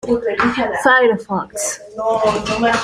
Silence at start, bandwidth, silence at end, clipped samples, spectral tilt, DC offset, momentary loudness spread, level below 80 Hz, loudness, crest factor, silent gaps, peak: 0.05 s; 15.5 kHz; 0 s; under 0.1%; -3.5 dB/octave; under 0.1%; 10 LU; -46 dBFS; -17 LUFS; 16 dB; none; -2 dBFS